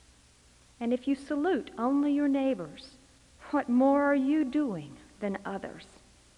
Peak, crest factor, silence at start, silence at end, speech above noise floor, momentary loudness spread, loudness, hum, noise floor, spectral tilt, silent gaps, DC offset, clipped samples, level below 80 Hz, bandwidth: -14 dBFS; 16 dB; 0.8 s; 0.55 s; 31 dB; 16 LU; -29 LUFS; none; -60 dBFS; -6.5 dB/octave; none; under 0.1%; under 0.1%; -64 dBFS; 10.5 kHz